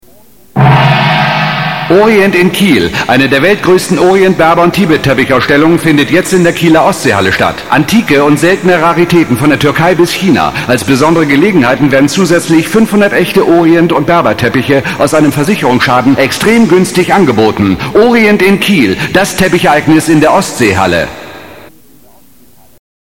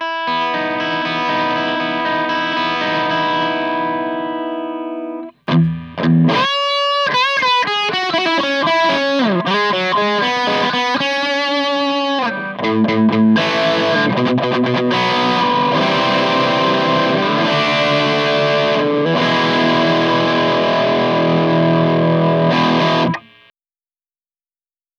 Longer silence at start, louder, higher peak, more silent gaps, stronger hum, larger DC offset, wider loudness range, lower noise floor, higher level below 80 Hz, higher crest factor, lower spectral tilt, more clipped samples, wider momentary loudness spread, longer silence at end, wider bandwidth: first, 0.55 s vs 0 s; first, -7 LUFS vs -15 LUFS; first, 0 dBFS vs -4 dBFS; neither; neither; neither; second, 1 LU vs 4 LU; second, -43 dBFS vs under -90 dBFS; first, -38 dBFS vs -56 dBFS; about the same, 8 dB vs 12 dB; about the same, -5.5 dB/octave vs -5.5 dB/octave; first, 0.4% vs under 0.1%; about the same, 4 LU vs 5 LU; second, 1.5 s vs 1.8 s; first, 17 kHz vs 10 kHz